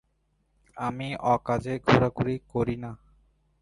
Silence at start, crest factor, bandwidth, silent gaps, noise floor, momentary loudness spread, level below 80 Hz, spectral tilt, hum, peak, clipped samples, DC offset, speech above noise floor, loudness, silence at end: 0.75 s; 22 dB; 11.5 kHz; none; -71 dBFS; 11 LU; -50 dBFS; -7 dB/octave; none; -6 dBFS; under 0.1%; under 0.1%; 45 dB; -27 LUFS; 0.65 s